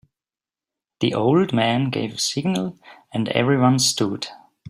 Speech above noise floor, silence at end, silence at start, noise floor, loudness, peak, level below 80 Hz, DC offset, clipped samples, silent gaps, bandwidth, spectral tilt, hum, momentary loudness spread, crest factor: over 70 dB; 0.35 s; 1 s; under -90 dBFS; -20 LUFS; -2 dBFS; -60 dBFS; under 0.1%; under 0.1%; none; 16 kHz; -4.5 dB/octave; none; 12 LU; 18 dB